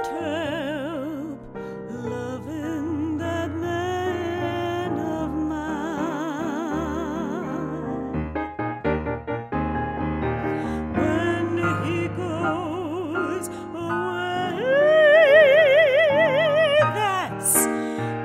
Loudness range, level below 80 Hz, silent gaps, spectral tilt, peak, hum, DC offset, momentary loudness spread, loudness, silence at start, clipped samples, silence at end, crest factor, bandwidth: 11 LU; -46 dBFS; none; -4.5 dB/octave; -4 dBFS; none; under 0.1%; 14 LU; -23 LUFS; 0 s; under 0.1%; 0 s; 18 dB; 16 kHz